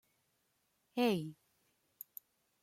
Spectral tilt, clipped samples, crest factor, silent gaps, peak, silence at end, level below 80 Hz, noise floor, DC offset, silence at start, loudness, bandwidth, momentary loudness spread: -6 dB/octave; under 0.1%; 20 dB; none; -22 dBFS; 1.3 s; -84 dBFS; -80 dBFS; under 0.1%; 0.95 s; -36 LUFS; 16.5 kHz; 20 LU